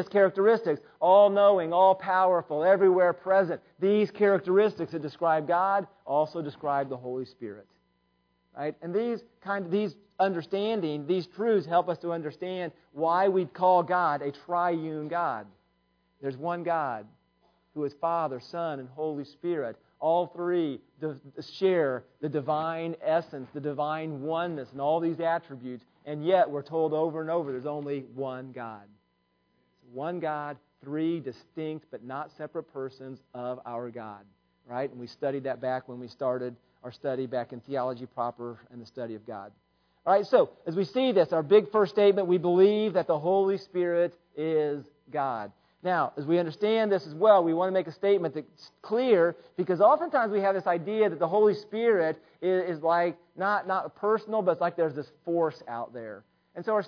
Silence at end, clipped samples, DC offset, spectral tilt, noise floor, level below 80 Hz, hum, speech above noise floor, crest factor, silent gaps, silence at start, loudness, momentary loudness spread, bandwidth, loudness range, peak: 0 s; under 0.1%; under 0.1%; -8 dB/octave; -73 dBFS; -78 dBFS; none; 46 dB; 20 dB; none; 0 s; -27 LUFS; 17 LU; 5.4 kHz; 11 LU; -8 dBFS